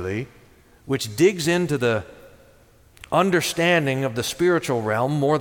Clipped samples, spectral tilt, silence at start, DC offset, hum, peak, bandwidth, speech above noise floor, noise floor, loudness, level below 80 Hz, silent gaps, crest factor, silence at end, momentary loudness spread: under 0.1%; -5 dB/octave; 0 s; under 0.1%; none; -6 dBFS; 18.5 kHz; 32 dB; -53 dBFS; -21 LUFS; -54 dBFS; none; 18 dB; 0 s; 9 LU